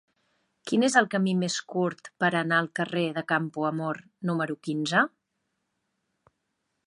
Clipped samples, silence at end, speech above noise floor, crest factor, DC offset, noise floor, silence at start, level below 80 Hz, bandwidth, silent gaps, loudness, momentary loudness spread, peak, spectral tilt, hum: under 0.1%; 1.8 s; 53 dB; 22 dB; under 0.1%; -79 dBFS; 0.65 s; -78 dBFS; 11.5 kHz; none; -27 LUFS; 9 LU; -6 dBFS; -5 dB/octave; none